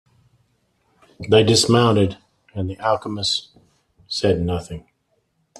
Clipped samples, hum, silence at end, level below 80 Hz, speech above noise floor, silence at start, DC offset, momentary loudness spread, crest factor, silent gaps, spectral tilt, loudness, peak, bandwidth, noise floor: under 0.1%; none; 0.8 s; -50 dBFS; 49 dB; 1.2 s; under 0.1%; 22 LU; 20 dB; none; -4.5 dB/octave; -19 LUFS; -2 dBFS; 13 kHz; -68 dBFS